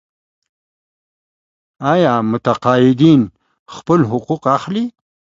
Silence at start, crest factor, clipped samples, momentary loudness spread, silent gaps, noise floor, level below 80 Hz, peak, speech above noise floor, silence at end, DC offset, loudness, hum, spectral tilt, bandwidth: 1.8 s; 16 dB; under 0.1%; 12 LU; 3.59-3.66 s; under -90 dBFS; -54 dBFS; 0 dBFS; over 76 dB; 0.5 s; under 0.1%; -15 LUFS; none; -7.5 dB/octave; 7.6 kHz